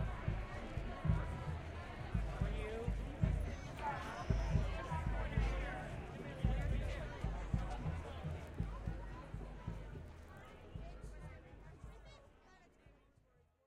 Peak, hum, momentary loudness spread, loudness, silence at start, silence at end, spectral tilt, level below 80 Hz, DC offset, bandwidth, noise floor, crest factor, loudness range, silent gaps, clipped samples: -22 dBFS; none; 16 LU; -43 LUFS; 0 s; 0.75 s; -7 dB/octave; -46 dBFS; under 0.1%; 11.5 kHz; -72 dBFS; 20 dB; 13 LU; none; under 0.1%